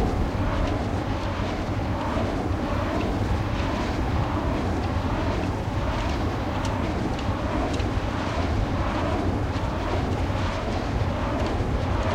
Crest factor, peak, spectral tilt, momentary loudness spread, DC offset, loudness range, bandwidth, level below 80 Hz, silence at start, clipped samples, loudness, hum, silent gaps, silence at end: 12 dB; -12 dBFS; -7 dB/octave; 2 LU; under 0.1%; 1 LU; 12.5 kHz; -32 dBFS; 0 s; under 0.1%; -26 LUFS; none; none; 0 s